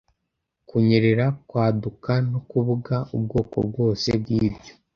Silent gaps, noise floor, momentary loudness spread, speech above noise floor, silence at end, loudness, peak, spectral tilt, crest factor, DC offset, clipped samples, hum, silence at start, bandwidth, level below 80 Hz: none; -79 dBFS; 8 LU; 57 dB; 0.25 s; -23 LUFS; -4 dBFS; -7.5 dB/octave; 18 dB; under 0.1%; under 0.1%; none; 0.75 s; 7 kHz; -48 dBFS